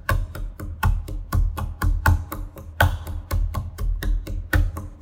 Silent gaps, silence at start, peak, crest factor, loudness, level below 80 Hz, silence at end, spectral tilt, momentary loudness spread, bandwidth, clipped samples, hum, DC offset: none; 0.05 s; -2 dBFS; 22 dB; -26 LUFS; -26 dBFS; 0 s; -5.5 dB/octave; 12 LU; 17 kHz; under 0.1%; none; under 0.1%